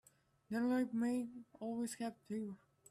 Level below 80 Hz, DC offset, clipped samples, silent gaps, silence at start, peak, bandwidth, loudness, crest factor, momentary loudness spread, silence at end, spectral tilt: -82 dBFS; under 0.1%; under 0.1%; none; 0.5 s; -28 dBFS; 14 kHz; -41 LUFS; 14 dB; 13 LU; 0.35 s; -5.5 dB/octave